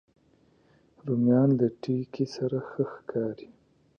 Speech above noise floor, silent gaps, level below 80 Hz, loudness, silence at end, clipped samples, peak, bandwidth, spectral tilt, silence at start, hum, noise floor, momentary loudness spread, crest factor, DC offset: 37 dB; none; -70 dBFS; -28 LUFS; 0.55 s; under 0.1%; -12 dBFS; 6.8 kHz; -9 dB/octave; 1.05 s; none; -64 dBFS; 11 LU; 18 dB; under 0.1%